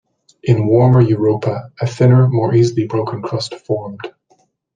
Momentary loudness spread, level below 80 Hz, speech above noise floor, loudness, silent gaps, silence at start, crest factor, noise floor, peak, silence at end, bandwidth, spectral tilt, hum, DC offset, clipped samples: 12 LU; -50 dBFS; 44 dB; -15 LUFS; none; 0.45 s; 14 dB; -58 dBFS; -2 dBFS; 0.65 s; 9.2 kHz; -8 dB/octave; none; under 0.1%; under 0.1%